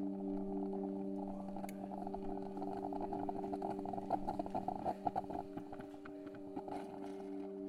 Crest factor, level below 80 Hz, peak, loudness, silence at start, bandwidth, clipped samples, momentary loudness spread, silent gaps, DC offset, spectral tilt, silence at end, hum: 22 dB; -60 dBFS; -22 dBFS; -44 LUFS; 0 s; 14 kHz; under 0.1%; 8 LU; none; under 0.1%; -8 dB/octave; 0 s; none